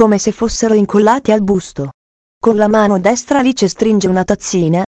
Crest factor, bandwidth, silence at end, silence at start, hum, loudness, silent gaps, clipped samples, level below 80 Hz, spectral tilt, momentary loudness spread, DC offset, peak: 12 dB; 8.6 kHz; 0.05 s; 0 s; none; -13 LUFS; 1.94-2.41 s; 0.2%; -40 dBFS; -5.5 dB/octave; 6 LU; under 0.1%; 0 dBFS